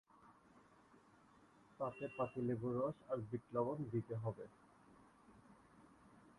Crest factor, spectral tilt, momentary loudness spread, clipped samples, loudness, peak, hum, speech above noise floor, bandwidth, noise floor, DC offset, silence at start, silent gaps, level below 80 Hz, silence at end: 20 dB; -9.5 dB/octave; 25 LU; under 0.1%; -44 LUFS; -28 dBFS; none; 26 dB; 11 kHz; -69 dBFS; under 0.1%; 0.2 s; none; -76 dBFS; 0.05 s